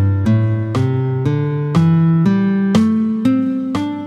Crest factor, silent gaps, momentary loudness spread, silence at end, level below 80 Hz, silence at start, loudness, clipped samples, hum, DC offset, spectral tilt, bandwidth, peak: 14 dB; none; 5 LU; 0 s; -48 dBFS; 0 s; -16 LUFS; under 0.1%; none; under 0.1%; -8.5 dB/octave; 9.8 kHz; -2 dBFS